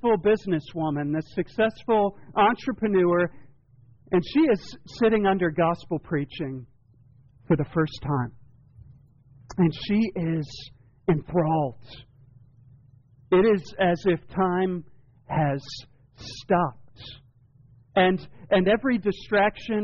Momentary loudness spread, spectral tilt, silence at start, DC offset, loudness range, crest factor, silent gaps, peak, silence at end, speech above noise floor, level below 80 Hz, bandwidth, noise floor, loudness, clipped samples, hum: 15 LU; -5.5 dB/octave; 0.05 s; under 0.1%; 5 LU; 14 dB; none; -10 dBFS; 0 s; 32 dB; -52 dBFS; 7.2 kHz; -56 dBFS; -25 LUFS; under 0.1%; none